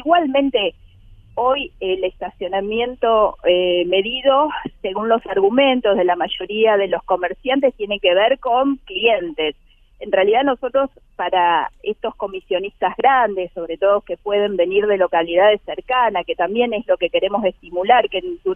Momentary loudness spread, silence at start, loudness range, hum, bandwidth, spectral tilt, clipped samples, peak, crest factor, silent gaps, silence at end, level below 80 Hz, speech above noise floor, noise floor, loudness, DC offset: 9 LU; 0 s; 3 LU; none; 3.7 kHz; -7 dB/octave; under 0.1%; 0 dBFS; 18 dB; none; 0 s; -48 dBFS; 27 dB; -45 dBFS; -18 LUFS; under 0.1%